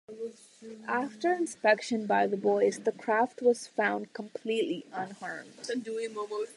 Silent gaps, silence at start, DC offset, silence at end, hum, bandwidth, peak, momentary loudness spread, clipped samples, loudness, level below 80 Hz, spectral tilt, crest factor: none; 0.1 s; under 0.1%; 0.05 s; none; 11.5 kHz; -12 dBFS; 14 LU; under 0.1%; -30 LUFS; -84 dBFS; -4.5 dB/octave; 18 dB